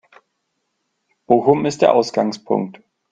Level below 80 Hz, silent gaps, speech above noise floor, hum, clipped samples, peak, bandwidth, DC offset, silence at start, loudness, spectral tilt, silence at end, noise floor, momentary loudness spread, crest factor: -60 dBFS; none; 56 dB; none; under 0.1%; 0 dBFS; 9.2 kHz; under 0.1%; 1.3 s; -17 LUFS; -6 dB/octave; 0.4 s; -73 dBFS; 7 LU; 18 dB